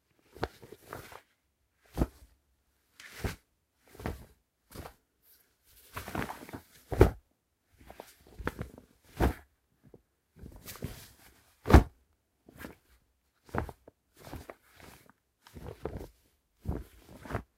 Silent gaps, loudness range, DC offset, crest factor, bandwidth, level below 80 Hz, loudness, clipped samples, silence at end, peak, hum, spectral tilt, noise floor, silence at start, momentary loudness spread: none; 14 LU; under 0.1%; 32 dB; 16 kHz; -40 dBFS; -33 LUFS; under 0.1%; 0.15 s; -4 dBFS; none; -7 dB/octave; -76 dBFS; 0.4 s; 26 LU